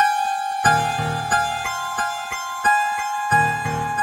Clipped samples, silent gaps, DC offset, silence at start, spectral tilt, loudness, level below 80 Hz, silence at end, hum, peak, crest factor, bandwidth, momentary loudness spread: under 0.1%; none; under 0.1%; 0 s; -3 dB/octave; -21 LUFS; -50 dBFS; 0 s; none; -2 dBFS; 18 dB; 16 kHz; 6 LU